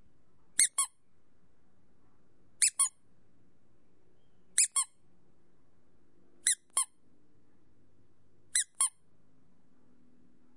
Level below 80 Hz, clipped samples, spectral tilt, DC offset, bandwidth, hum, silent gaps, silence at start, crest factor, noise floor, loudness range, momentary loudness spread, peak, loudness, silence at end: -80 dBFS; under 0.1%; 3.5 dB/octave; 0.2%; 11.5 kHz; none; none; 0.6 s; 30 dB; -71 dBFS; 5 LU; 7 LU; -8 dBFS; -29 LUFS; 1.7 s